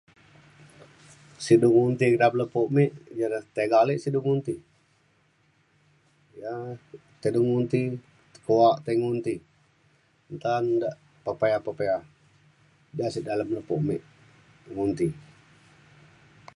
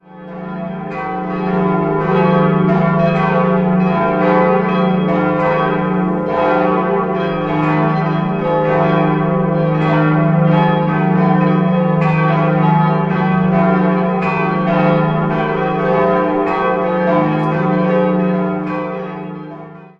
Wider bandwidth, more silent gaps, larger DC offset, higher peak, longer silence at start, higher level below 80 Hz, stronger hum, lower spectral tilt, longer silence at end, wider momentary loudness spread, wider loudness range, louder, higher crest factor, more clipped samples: first, 11.5 kHz vs 5.4 kHz; neither; neither; second, -6 dBFS vs -2 dBFS; first, 1.4 s vs 0.1 s; second, -64 dBFS vs -46 dBFS; neither; second, -7.5 dB/octave vs -10 dB/octave; first, 1.35 s vs 0.1 s; first, 16 LU vs 8 LU; first, 8 LU vs 2 LU; second, -26 LUFS vs -15 LUFS; first, 20 dB vs 12 dB; neither